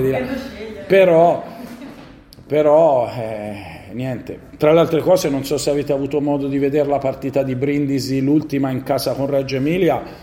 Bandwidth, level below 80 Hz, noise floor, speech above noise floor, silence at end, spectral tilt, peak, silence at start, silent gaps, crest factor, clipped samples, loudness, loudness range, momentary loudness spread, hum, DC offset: 16.5 kHz; -48 dBFS; -41 dBFS; 24 dB; 0 s; -6.5 dB/octave; -2 dBFS; 0 s; none; 16 dB; under 0.1%; -18 LUFS; 2 LU; 17 LU; none; under 0.1%